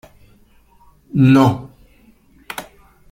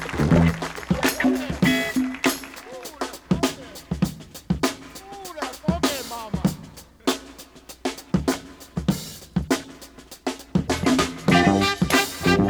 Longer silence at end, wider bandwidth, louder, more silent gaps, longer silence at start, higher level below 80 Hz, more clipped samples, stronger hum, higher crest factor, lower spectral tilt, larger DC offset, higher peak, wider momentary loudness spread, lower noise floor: first, 0.5 s vs 0 s; second, 16 kHz vs over 20 kHz; first, -14 LUFS vs -24 LUFS; neither; first, 1.15 s vs 0 s; second, -48 dBFS vs -40 dBFS; neither; neither; about the same, 18 dB vs 20 dB; first, -7.5 dB/octave vs -5 dB/octave; neither; about the same, -2 dBFS vs -4 dBFS; about the same, 20 LU vs 18 LU; first, -51 dBFS vs -44 dBFS